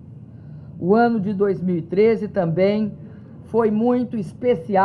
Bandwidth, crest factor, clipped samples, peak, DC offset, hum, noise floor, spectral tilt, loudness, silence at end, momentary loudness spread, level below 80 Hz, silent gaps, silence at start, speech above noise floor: 9.8 kHz; 16 dB; under 0.1%; -4 dBFS; under 0.1%; none; -39 dBFS; -9.5 dB/octave; -20 LUFS; 0 s; 22 LU; -60 dBFS; none; 0 s; 20 dB